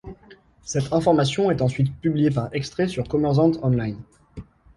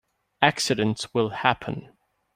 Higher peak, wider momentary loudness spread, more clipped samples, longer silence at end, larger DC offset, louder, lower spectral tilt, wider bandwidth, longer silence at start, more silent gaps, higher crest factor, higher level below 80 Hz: second, -6 dBFS vs -2 dBFS; first, 23 LU vs 11 LU; neither; second, 0.35 s vs 0.5 s; neither; about the same, -22 LUFS vs -24 LUFS; first, -7 dB/octave vs -4 dB/octave; second, 11.5 kHz vs 16 kHz; second, 0.05 s vs 0.4 s; neither; second, 16 dB vs 24 dB; first, -48 dBFS vs -60 dBFS